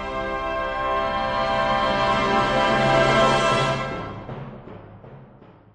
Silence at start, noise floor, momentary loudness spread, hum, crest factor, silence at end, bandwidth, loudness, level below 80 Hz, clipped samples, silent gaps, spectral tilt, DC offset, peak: 0 s; -48 dBFS; 18 LU; none; 16 dB; 0.25 s; 10 kHz; -21 LUFS; -42 dBFS; under 0.1%; none; -5 dB/octave; under 0.1%; -8 dBFS